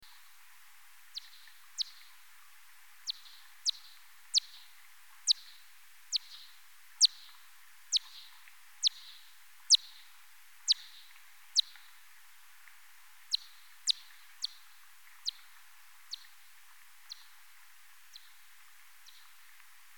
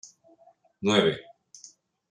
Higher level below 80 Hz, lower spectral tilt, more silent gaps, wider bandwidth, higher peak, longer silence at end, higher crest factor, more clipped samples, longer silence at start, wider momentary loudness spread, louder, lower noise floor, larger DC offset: second, under -90 dBFS vs -68 dBFS; second, 6 dB/octave vs -4.5 dB/octave; neither; first, 18 kHz vs 10.5 kHz; second, -12 dBFS vs -8 dBFS; first, 2.85 s vs 0.9 s; about the same, 26 dB vs 22 dB; neither; first, 1.15 s vs 0.05 s; first, 29 LU vs 26 LU; second, -32 LUFS vs -25 LUFS; about the same, -60 dBFS vs -60 dBFS; first, 0.2% vs under 0.1%